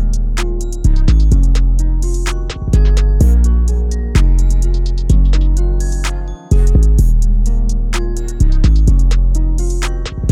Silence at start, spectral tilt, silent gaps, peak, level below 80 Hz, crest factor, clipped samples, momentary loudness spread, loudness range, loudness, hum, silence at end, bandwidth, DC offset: 0 s; -6 dB/octave; none; 0 dBFS; -10 dBFS; 10 dB; under 0.1%; 8 LU; 2 LU; -15 LUFS; none; 0 s; 11 kHz; under 0.1%